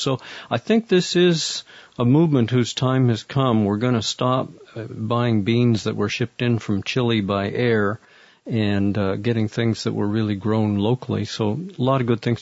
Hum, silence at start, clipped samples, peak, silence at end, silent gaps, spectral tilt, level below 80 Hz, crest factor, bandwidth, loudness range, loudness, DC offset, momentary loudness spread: none; 0 s; under 0.1%; -4 dBFS; 0 s; none; -6 dB/octave; -58 dBFS; 16 dB; 8 kHz; 3 LU; -21 LUFS; under 0.1%; 8 LU